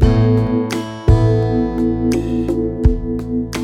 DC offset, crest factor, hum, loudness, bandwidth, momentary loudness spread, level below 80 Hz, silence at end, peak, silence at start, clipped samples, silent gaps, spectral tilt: under 0.1%; 14 dB; none; -17 LUFS; 13 kHz; 8 LU; -22 dBFS; 0 s; 0 dBFS; 0 s; under 0.1%; none; -8 dB/octave